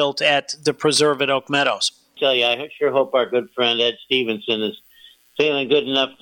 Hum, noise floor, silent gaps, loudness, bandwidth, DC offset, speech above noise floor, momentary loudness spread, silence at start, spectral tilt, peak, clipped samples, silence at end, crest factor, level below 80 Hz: none; -50 dBFS; none; -19 LUFS; 18 kHz; under 0.1%; 30 dB; 6 LU; 0 s; -3 dB/octave; -6 dBFS; under 0.1%; 0.1 s; 14 dB; -70 dBFS